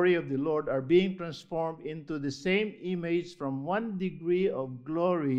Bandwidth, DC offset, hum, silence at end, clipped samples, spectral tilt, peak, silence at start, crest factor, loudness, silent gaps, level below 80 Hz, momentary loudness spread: 8 kHz; under 0.1%; none; 0 s; under 0.1%; -7 dB/octave; -12 dBFS; 0 s; 18 dB; -31 LUFS; none; -64 dBFS; 10 LU